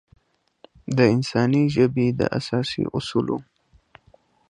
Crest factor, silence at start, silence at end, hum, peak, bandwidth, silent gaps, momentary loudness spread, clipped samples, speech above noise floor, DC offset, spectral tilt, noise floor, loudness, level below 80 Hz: 20 dB; 0.9 s; 1.1 s; none; -4 dBFS; 10.5 kHz; none; 8 LU; under 0.1%; 37 dB; under 0.1%; -7 dB/octave; -58 dBFS; -22 LUFS; -54 dBFS